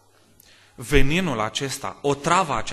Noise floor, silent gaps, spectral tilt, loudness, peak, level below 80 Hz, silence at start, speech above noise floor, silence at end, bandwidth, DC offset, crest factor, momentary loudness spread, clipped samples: -55 dBFS; none; -4.5 dB/octave; -23 LUFS; -2 dBFS; -30 dBFS; 0.8 s; 34 dB; 0 s; 13 kHz; under 0.1%; 20 dB; 7 LU; under 0.1%